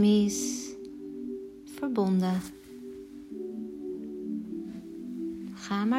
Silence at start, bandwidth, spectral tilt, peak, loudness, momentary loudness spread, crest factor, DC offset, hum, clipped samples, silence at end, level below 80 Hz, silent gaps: 0 s; 15.5 kHz; -5.5 dB/octave; -14 dBFS; -33 LUFS; 17 LU; 16 dB; under 0.1%; none; under 0.1%; 0 s; -64 dBFS; none